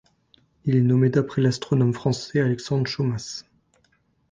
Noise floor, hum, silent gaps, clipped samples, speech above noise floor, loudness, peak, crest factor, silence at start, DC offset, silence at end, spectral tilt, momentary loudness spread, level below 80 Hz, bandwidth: -66 dBFS; none; none; under 0.1%; 44 dB; -23 LUFS; -6 dBFS; 16 dB; 0.65 s; under 0.1%; 0.9 s; -7 dB/octave; 12 LU; -56 dBFS; 9.2 kHz